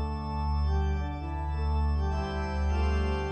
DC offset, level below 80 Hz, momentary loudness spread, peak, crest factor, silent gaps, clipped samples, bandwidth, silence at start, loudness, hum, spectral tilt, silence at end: under 0.1%; -30 dBFS; 5 LU; -18 dBFS; 10 dB; none; under 0.1%; 6.6 kHz; 0 s; -30 LUFS; none; -7.5 dB/octave; 0 s